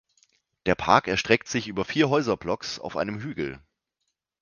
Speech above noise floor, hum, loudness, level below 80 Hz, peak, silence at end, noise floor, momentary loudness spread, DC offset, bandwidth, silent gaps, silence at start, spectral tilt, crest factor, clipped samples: 55 dB; none; -25 LUFS; -54 dBFS; -2 dBFS; 0.85 s; -81 dBFS; 11 LU; under 0.1%; 9.8 kHz; none; 0.65 s; -4.5 dB/octave; 24 dB; under 0.1%